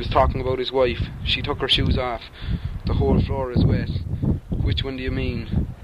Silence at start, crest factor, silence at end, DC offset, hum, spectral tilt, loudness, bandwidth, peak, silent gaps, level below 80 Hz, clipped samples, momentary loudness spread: 0 s; 18 dB; 0 s; under 0.1%; none; -7.5 dB/octave; -23 LUFS; 11 kHz; -4 dBFS; none; -28 dBFS; under 0.1%; 8 LU